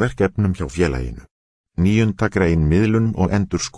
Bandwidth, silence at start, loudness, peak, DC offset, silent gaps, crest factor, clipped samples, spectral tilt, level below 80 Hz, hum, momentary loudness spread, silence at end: 11 kHz; 0 s; -19 LUFS; -2 dBFS; under 0.1%; 1.31-1.64 s; 16 dB; under 0.1%; -6.5 dB/octave; -32 dBFS; none; 5 LU; 0.1 s